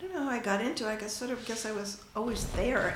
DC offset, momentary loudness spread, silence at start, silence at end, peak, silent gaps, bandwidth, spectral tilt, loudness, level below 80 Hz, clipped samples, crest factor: under 0.1%; 6 LU; 0 s; 0 s; -16 dBFS; none; 16.5 kHz; -4 dB/octave; -33 LUFS; -46 dBFS; under 0.1%; 16 dB